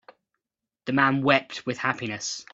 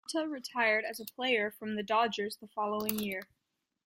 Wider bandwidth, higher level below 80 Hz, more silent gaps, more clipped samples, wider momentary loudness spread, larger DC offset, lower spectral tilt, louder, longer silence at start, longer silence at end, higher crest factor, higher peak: second, 7.8 kHz vs 16.5 kHz; first, -68 dBFS vs -76 dBFS; neither; neither; about the same, 11 LU vs 9 LU; neither; about the same, -4 dB/octave vs -3.5 dB/octave; first, -24 LUFS vs -33 LUFS; first, 0.85 s vs 0.1 s; second, 0.1 s vs 0.6 s; about the same, 24 dB vs 24 dB; first, -4 dBFS vs -10 dBFS